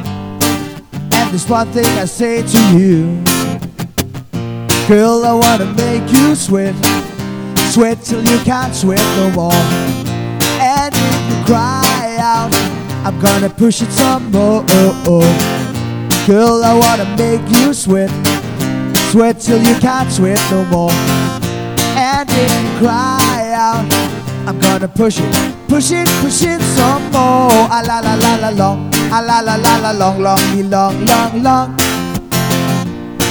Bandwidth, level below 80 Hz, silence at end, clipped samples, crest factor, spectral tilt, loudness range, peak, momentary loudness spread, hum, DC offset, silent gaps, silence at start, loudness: over 20 kHz; -40 dBFS; 0 s; under 0.1%; 12 dB; -4.5 dB/octave; 2 LU; 0 dBFS; 8 LU; none; under 0.1%; none; 0 s; -12 LUFS